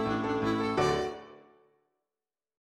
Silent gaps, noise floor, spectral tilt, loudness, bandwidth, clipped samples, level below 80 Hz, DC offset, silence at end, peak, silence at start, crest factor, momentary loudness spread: none; under -90 dBFS; -5.5 dB/octave; -30 LUFS; 13.5 kHz; under 0.1%; -56 dBFS; under 0.1%; 1.25 s; -14 dBFS; 0 s; 20 dB; 9 LU